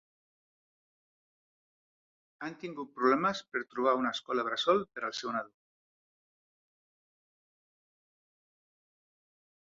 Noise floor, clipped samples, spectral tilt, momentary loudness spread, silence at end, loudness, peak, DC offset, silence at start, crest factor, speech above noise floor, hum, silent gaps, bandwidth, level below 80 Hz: under -90 dBFS; under 0.1%; -2 dB/octave; 14 LU; 4.15 s; -32 LUFS; -14 dBFS; under 0.1%; 2.4 s; 24 dB; over 58 dB; none; none; 7.4 kHz; -78 dBFS